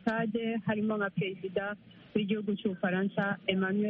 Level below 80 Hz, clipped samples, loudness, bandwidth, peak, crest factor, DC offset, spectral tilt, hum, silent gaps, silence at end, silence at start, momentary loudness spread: -70 dBFS; under 0.1%; -32 LUFS; 4.9 kHz; -14 dBFS; 18 dB; under 0.1%; -5 dB/octave; none; none; 0 s; 0.05 s; 5 LU